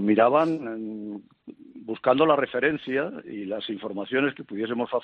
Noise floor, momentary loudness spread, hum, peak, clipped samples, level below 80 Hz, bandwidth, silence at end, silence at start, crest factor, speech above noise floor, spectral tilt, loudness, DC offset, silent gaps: -47 dBFS; 16 LU; none; -6 dBFS; under 0.1%; -70 dBFS; 5.8 kHz; 0 s; 0 s; 20 dB; 23 dB; -4 dB/octave; -25 LUFS; under 0.1%; none